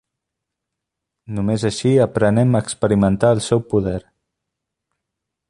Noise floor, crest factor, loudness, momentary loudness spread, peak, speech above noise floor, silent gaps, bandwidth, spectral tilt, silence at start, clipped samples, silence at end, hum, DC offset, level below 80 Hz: -82 dBFS; 18 dB; -18 LUFS; 9 LU; 0 dBFS; 65 dB; none; 11.5 kHz; -6.5 dB/octave; 1.3 s; under 0.1%; 1.5 s; none; under 0.1%; -44 dBFS